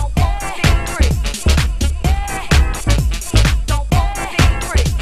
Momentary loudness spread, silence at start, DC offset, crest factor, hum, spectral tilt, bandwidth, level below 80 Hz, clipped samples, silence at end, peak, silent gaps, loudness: 4 LU; 0 s; 1%; 12 dB; none; -4.5 dB/octave; 15 kHz; -16 dBFS; under 0.1%; 0 s; -2 dBFS; none; -17 LUFS